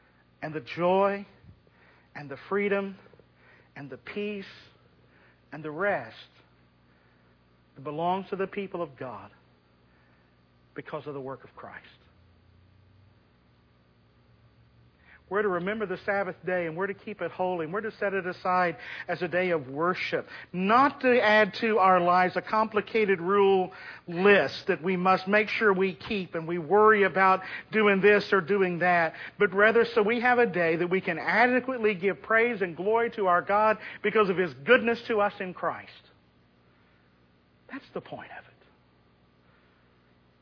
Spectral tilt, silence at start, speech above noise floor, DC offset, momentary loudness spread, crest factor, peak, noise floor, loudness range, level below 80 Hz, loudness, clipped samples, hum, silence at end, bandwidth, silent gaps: -7 dB/octave; 0.4 s; 37 dB; under 0.1%; 19 LU; 20 dB; -8 dBFS; -63 dBFS; 20 LU; -68 dBFS; -26 LUFS; under 0.1%; 60 Hz at -60 dBFS; 2 s; 5.4 kHz; none